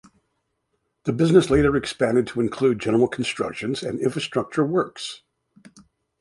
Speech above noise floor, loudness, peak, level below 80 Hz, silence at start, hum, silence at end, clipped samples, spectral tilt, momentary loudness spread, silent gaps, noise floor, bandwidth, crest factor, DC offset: 53 dB; -22 LUFS; -2 dBFS; -46 dBFS; 1.05 s; none; 1.05 s; under 0.1%; -6 dB/octave; 12 LU; none; -74 dBFS; 11.5 kHz; 20 dB; under 0.1%